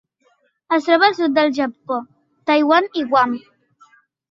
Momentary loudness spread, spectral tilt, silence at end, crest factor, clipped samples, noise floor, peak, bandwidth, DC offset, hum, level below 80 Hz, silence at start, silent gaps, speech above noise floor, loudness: 12 LU; -4.5 dB/octave; 0.9 s; 18 dB; under 0.1%; -62 dBFS; -2 dBFS; 7.4 kHz; under 0.1%; none; -70 dBFS; 0.7 s; none; 45 dB; -17 LUFS